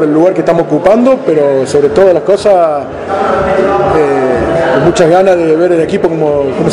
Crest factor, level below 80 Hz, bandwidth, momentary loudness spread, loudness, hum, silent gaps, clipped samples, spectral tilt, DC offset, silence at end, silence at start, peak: 8 dB; -36 dBFS; 11 kHz; 4 LU; -9 LUFS; none; none; 2%; -6.5 dB/octave; under 0.1%; 0 s; 0 s; 0 dBFS